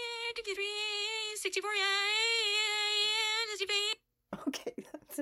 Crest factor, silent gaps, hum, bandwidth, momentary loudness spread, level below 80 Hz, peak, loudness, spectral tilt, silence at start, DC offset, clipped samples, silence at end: 16 dB; none; none; 16 kHz; 13 LU; -76 dBFS; -18 dBFS; -31 LUFS; 0 dB/octave; 0 s; under 0.1%; under 0.1%; 0 s